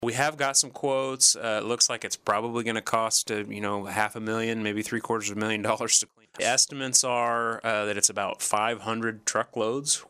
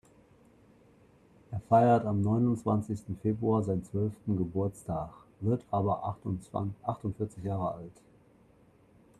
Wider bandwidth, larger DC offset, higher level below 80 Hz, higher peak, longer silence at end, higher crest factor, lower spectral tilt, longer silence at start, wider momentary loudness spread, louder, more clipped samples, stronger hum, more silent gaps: first, 15.5 kHz vs 11.5 kHz; neither; second, -72 dBFS vs -60 dBFS; first, -6 dBFS vs -12 dBFS; second, 0.05 s vs 1.3 s; about the same, 20 dB vs 20 dB; second, -1.5 dB/octave vs -9.5 dB/octave; second, 0 s vs 1.5 s; second, 8 LU vs 12 LU; first, -25 LUFS vs -31 LUFS; neither; neither; neither